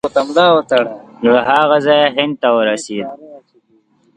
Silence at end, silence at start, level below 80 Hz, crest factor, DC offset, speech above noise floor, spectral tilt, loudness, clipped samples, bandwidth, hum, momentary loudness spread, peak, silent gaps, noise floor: 0.8 s; 0.05 s; -58 dBFS; 14 dB; under 0.1%; 43 dB; -4.5 dB/octave; -13 LUFS; under 0.1%; 10.5 kHz; none; 12 LU; 0 dBFS; none; -55 dBFS